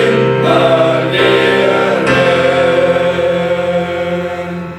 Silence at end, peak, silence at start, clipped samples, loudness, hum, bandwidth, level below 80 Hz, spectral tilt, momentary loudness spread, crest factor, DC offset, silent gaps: 0 s; 0 dBFS; 0 s; under 0.1%; -12 LUFS; none; 13 kHz; -46 dBFS; -6 dB/octave; 7 LU; 12 dB; under 0.1%; none